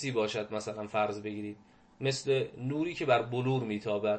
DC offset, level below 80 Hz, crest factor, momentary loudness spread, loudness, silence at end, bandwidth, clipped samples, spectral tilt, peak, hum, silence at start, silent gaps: under 0.1%; -72 dBFS; 18 dB; 10 LU; -32 LUFS; 0 s; 8.8 kHz; under 0.1%; -5.5 dB/octave; -14 dBFS; none; 0 s; none